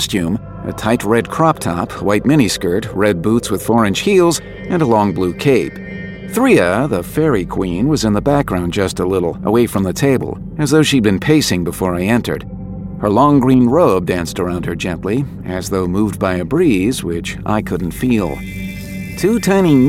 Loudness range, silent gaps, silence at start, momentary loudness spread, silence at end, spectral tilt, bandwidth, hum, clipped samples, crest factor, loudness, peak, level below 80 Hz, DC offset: 3 LU; none; 0 s; 11 LU; 0 s; -6 dB/octave; 16.5 kHz; none; under 0.1%; 14 dB; -15 LUFS; 0 dBFS; -36 dBFS; under 0.1%